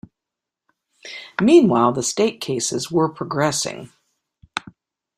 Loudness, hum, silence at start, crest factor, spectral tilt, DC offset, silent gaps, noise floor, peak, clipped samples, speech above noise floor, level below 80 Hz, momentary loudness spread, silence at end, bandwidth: -19 LUFS; none; 1.05 s; 20 dB; -4.5 dB/octave; under 0.1%; none; -85 dBFS; -2 dBFS; under 0.1%; 67 dB; -60 dBFS; 18 LU; 0.6 s; 14.5 kHz